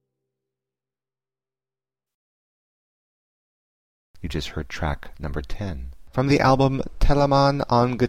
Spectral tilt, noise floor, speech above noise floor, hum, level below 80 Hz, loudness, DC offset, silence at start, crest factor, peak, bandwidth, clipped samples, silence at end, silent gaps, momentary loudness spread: -7 dB/octave; under -90 dBFS; over 69 dB; none; -34 dBFS; -23 LUFS; under 0.1%; 4.2 s; 18 dB; -6 dBFS; 14 kHz; under 0.1%; 0 s; none; 15 LU